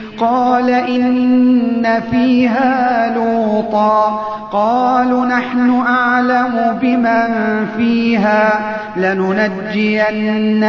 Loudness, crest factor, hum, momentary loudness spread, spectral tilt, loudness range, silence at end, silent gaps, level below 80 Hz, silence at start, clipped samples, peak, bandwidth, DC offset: -14 LUFS; 12 dB; 50 Hz at -55 dBFS; 4 LU; -7 dB/octave; 1 LU; 0 s; none; -52 dBFS; 0 s; under 0.1%; -2 dBFS; 6.4 kHz; under 0.1%